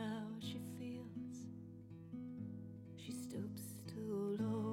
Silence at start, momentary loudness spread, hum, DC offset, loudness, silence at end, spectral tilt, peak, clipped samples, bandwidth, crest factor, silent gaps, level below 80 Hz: 0 s; 12 LU; none; under 0.1%; -47 LUFS; 0 s; -6.5 dB/octave; -30 dBFS; under 0.1%; 17 kHz; 16 dB; none; -78 dBFS